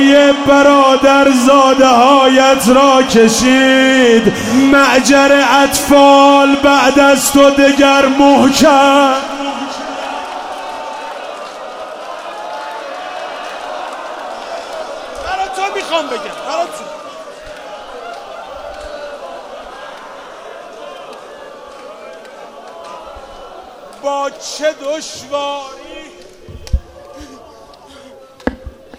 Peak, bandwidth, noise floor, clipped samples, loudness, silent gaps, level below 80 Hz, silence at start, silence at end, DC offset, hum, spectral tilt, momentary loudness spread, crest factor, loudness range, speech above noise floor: 0 dBFS; 16 kHz; -38 dBFS; 0.2%; -10 LUFS; none; -36 dBFS; 0 s; 0.3 s; under 0.1%; none; -3 dB/octave; 23 LU; 12 dB; 22 LU; 29 dB